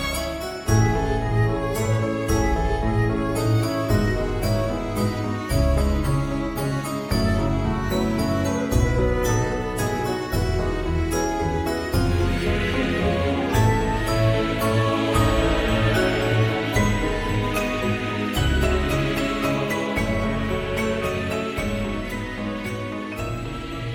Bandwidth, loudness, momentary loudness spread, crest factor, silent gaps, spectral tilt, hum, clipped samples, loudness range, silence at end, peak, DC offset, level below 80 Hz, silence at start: 17.5 kHz; -23 LUFS; 6 LU; 16 dB; none; -6 dB/octave; none; under 0.1%; 3 LU; 0 s; -6 dBFS; under 0.1%; -30 dBFS; 0 s